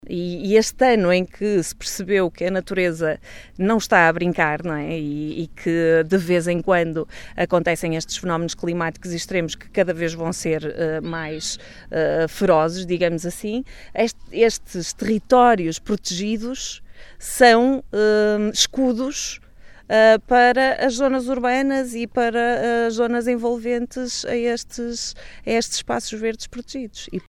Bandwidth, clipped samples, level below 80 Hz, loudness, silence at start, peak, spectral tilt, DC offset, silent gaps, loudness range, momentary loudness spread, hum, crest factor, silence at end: 17 kHz; under 0.1%; -46 dBFS; -20 LUFS; 0.05 s; 0 dBFS; -4.5 dB/octave; under 0.1%; none; 6 LU; 13 LU; none; 20 dB; 0.1 s